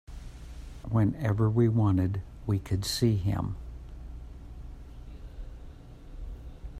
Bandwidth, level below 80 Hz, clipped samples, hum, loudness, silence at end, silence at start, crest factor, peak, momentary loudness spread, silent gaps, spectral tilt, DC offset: 14.5 kHz; -44 dBFS; under 0.1%; none; -28 LUFS; 0 s; 0.1 s; 18 dB; -12 dBFS; 22 LU; none; -7 dB/octave; under 0.1%